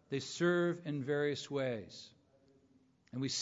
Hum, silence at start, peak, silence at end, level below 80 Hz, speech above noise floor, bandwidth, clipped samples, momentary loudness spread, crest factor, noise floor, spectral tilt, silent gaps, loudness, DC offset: none; 0.1 s; -20 dBFS; 0 s; -78 dBFS; 34 dB; 7.4 kHz; under 0.1%; 18 LU; 18 dB; -70 dBFS; -4.5 dB/octave; none; -36 LUFS; under 0.1%